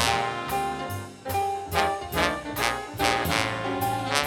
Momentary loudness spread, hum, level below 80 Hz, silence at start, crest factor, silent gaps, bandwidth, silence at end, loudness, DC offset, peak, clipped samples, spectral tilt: 6 LU; none; -46 dBFS; 0 s; 24 dB; none; 19.5 kHz; 0 s; -27 LUFS; under 0.1%; -2 dBFS; under 0.1%; -3.5 dB/octave